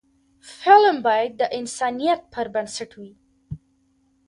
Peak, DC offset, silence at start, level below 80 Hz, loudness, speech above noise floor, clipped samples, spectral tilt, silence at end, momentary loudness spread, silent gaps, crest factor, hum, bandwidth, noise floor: -2 dBFS; under 0.1%; 0.45 s; -58 dBFS; -20 LUFS; 44 dB; under 0.1%; -3.5 dB/octave; 0.7 s; 25 LU; none; 20 dB; none; 11.5 kHz; -64 dBFS